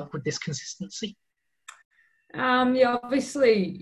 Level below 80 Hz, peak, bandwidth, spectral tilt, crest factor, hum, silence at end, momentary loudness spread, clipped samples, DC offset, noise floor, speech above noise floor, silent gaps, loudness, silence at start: -64 dBFS; -8 dBFS; 12 kHz; -4.5 dB/octave; 18 dB; none; 0 s; 14 LU; under 0.1%; under 0.1%; -52 dBFS; 27 dB; 1.85-1.91 s; -25 LUFS; 0 s